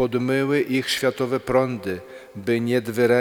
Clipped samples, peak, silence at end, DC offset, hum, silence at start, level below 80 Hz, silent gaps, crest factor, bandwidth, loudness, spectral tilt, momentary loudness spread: under 0.1%; -6 dBFS; 0 s; under 0.1%; none; 0 s; -56 dBFS; none; 16 dB; 19.5 kHz; -22 LUFS; -5.5 dB/octave; 10 LU